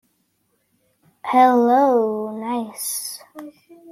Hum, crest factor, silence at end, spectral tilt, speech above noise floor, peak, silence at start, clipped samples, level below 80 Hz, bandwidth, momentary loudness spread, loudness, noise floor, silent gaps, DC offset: none; 18 dB; 0 s; -3.5 dB/octave; 49 dB; -4 dBFS; 1.25 s; under 0.1%; -74 dBFS; 16 kHz; 21 LU; -18 LUFS; -68 dBFS; none; under 0.1%